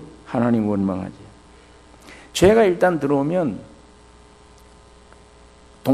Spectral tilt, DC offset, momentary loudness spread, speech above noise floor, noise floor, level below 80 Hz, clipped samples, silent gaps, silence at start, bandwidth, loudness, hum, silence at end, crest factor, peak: -6 dB/octave; under 0.1%; 14 LU; 30 dB; -48 dBFS; -48 dBFS; under 0.1%; none; 0 s; 13 kHz; -19 LUFS; none; 0 s; 20 dB; -2 dBFS